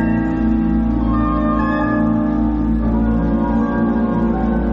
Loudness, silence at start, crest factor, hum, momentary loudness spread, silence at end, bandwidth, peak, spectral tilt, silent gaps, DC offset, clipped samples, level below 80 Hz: -17 LUFS; 0 s; 8 dB; none; 1 LU; 0 s; 5.4 kHz; -8 dBFS; -10.5 dB/octave; none; under 0.1%; under 0.1%; -24 dBFS